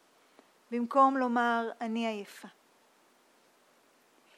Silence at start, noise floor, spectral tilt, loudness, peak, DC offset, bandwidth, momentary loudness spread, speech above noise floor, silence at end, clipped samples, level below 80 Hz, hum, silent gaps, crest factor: 0.7 s; -66 dBFS; -5 dB/octave; -30 LUFS; -12 dBFS; under 0.1%; 14 kHz; 17 LU; 36 dB; 1.9 s; under 0.1%; under -90 dBFS; none; none; 20 dB